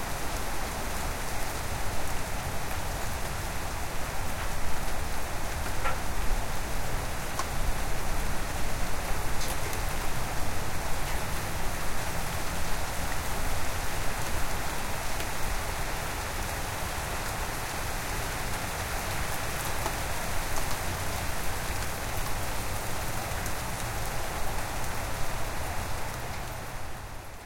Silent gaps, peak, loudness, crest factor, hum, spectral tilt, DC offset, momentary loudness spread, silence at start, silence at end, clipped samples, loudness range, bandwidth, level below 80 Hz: none; -14 dBFS; -33 LUFS; 14 dB; none; -3.5 dB/octave; under 0.1%; 2 LU; 0 s; 0 s; under 0.1%; 2 LU; 17 kHz; -36 dBFS